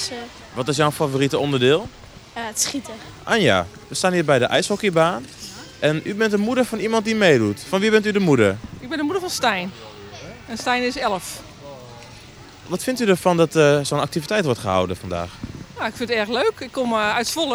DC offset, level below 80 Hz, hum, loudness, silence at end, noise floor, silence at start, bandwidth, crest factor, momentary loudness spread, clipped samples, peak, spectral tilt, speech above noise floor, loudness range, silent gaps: under 0.1%; -52 dBFS; none; -20 LUFS; 0 s; -42 dBFS; 0 s; over 20 kHz; 20 dB; 18 LU; under 0.1%; -2 dBFS; -4.5 dB/octave; 22 dB; 5 LU; none